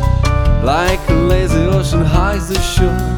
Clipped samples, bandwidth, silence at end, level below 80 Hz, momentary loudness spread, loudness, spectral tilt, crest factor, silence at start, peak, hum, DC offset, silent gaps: under 0.1%; 18 kHz; 0 s; -16 dBFS; 2 LU; -14 LUFS; -6 dB/octave; 12 dB; 0 s; 0 dBFS; none; under 0.1%; none